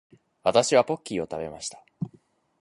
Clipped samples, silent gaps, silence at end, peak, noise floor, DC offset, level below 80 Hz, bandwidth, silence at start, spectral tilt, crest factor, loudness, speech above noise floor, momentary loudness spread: under 0.1%; none; 0.55 s; -4 dBFS; -61 dBFS; under 0.1%; -62 dBFS; 11.5 kHz; 0.45 s; -4 dB/octave; 22 dB; -25 LUFS; 36 dB; 17 LU